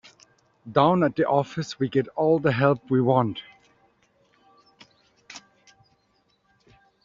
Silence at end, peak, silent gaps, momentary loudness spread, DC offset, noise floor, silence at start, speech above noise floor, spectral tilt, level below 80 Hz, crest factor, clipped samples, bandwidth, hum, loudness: 1.65 s; -4 dBFS; none; 22 LU; under 0.1%; -68 dBFS; 0.65 s; 45 dB; -6 dB/octave; -62 dBFS; 22 dB; under 0.1%; 7.6 kHz; none; -23 LUFS